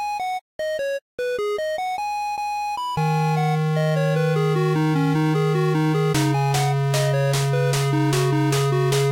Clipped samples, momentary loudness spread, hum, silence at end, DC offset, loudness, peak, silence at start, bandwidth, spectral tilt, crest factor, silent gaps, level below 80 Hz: under 0.1%; 6 LU; none; 0 s; under 0.1%; -21 LUFS; -10 dBFS; 0 s; 16 kHz; -6 dB/octave; 10 dB; 0.41-0.59 s, 1.02-1.18 s; -54 dBFS